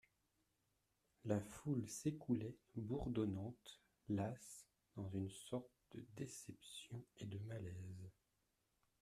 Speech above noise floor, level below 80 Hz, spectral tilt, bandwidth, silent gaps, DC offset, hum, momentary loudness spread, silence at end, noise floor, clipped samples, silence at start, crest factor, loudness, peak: 39 dB; -70 dBFS; -6.5 dB/octave; 14.5 kHz; none; under 0.1%; none; 16 LU; 0.9 s; -86 dBFS; under 0.1%; 1.25 s; 22 dB; -48 LUFS; -26 dBFS